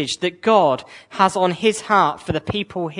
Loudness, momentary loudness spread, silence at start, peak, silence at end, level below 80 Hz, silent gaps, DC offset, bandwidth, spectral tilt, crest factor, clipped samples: -19 LUFS; 9 LU; 0 s; -2 dBFS; 0 s; -52 dBFS; none; under 0.1%; 11 kHz; -4.5 dB/octave; 18 dB; under 0.1%